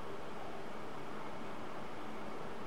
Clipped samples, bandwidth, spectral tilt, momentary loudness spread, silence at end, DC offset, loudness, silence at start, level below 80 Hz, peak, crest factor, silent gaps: under 0.1%; 16 kHz; -5.5 dB/octave; 1 LU; 0 s; 1%; -47 LUFS; 0 s; -68 dBFS; -30 dBFS; 14 dB; none